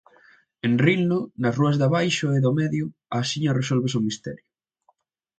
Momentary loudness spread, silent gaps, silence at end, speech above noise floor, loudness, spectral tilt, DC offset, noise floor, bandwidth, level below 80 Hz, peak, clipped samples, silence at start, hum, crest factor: 9 LU; none; 1 s; 45 dB; -23 LUFS; -6 dB/octave; under 0.1%; -67 dBFS; 9 kHz; -62 dBFS; -4 dBFS; under 0.1%; 0.65 s; none; 18 dB